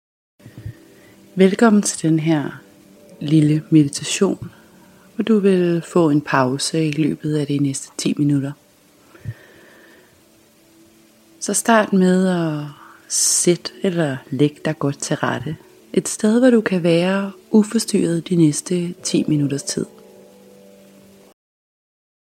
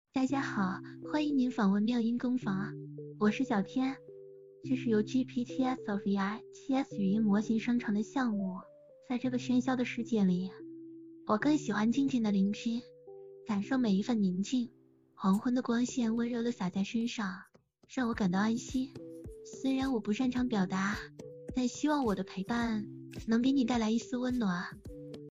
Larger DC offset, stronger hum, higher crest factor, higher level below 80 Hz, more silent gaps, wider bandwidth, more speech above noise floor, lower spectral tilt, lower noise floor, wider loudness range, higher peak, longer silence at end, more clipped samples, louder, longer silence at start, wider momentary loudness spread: neither; neither; about the same, 20 dB vs 16 dB; about the same, -60 dBFS vs -62 dBFS; neither; first, 15.5 kHz vs 8.6 kHz; first, 35 dB vs 21 dB; about the same, -5 dB/octave vs -6 dB/octave; about the same, -52 dBFS vs -53 dBFS; first, 7 LU vs 2 LU; first, 0 dBFS vs -16 dBFS; first, 2.5 s vs 0 s; neither; first, -18 LUFS vs -32 LUFS; first, 0.45 s vs 0.15 s; about the same, 16 LU vs 15 LU